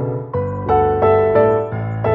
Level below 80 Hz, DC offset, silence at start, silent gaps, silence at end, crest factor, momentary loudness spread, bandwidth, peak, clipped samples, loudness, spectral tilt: -38 dBFS; under 0.1%; 0 s; none; 0 s; 14 dB; 9 LU; 4.5 kHz; -2 dBFS; under 0.1%; -16 LUFS; -10.5 dB/octave